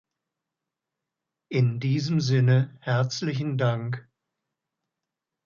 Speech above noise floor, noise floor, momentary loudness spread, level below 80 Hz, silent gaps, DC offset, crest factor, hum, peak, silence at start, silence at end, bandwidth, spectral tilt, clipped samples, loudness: 63 dB; -86 dBFS; 9 LU; -66 dBFS; none; under 0.1%; 16 dB; none; -10 dBFS; 1.5 s; 1.45 s; 7.2 kHz; -6.5 dB/octave; under 0.1%; -25 LUFS